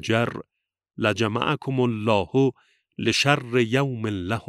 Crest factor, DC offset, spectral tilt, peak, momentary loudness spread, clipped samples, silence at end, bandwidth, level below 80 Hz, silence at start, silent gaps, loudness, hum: 22 dB; under 0.1%; -5.5 dB/octave; -2 dBFS; 8 LU; under 0.1%; 0.1 s; 14.5 kHz; -58 dBFS; 0 s; none; -23 LUFS; none